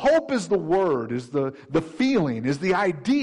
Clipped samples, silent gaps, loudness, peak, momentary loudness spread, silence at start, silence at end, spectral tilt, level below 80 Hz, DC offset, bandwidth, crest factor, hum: under 0.1%; none; -24 LUFS; -12 dBFS; 6 LU; 0 s; 0 s; -6 dB/octave; -56 dBFS; under 0.1%; 11 kHz; 10 dB; none